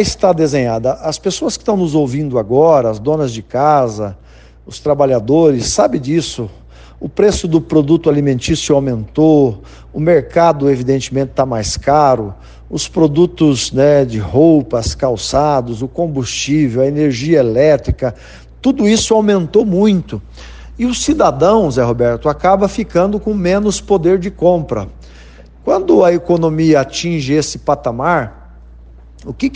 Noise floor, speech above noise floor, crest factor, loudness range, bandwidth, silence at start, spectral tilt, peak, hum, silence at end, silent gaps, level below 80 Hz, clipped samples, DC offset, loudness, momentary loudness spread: -37 dBFS; 25 dB; 14 dB; 2 LU; 9.8 kHz; 0 s; -6 dB/octave; 0 dBFS; none; 0 s; none; -34 dBFS; under 0.1%; under 0.1%; -13 LUFS; 9 LU